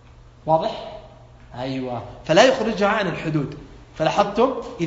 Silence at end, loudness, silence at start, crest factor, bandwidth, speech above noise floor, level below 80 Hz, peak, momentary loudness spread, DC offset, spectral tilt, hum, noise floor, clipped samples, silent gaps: 0 s; -21 LUFS; 0.45 s; 22 dB; 7.8 kHz; 24 dB; -48 dBFS; 0 dBFS; 22 LU; under 0.1%; -5 dB/octave; none; -45 dBFS; under 0.1%; none